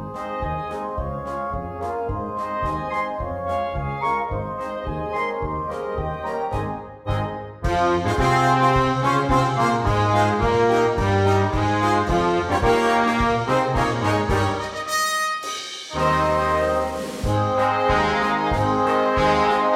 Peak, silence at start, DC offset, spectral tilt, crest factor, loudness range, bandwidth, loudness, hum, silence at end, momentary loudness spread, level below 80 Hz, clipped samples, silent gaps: -6 dBFS; 0 s; under 0.1%; -5.5 dB/octave; 16 dB; 8 LU; 16 kHz; -21 LUFS; none; 0 s; 10 LU; -36 dBFS; under 0.1%; none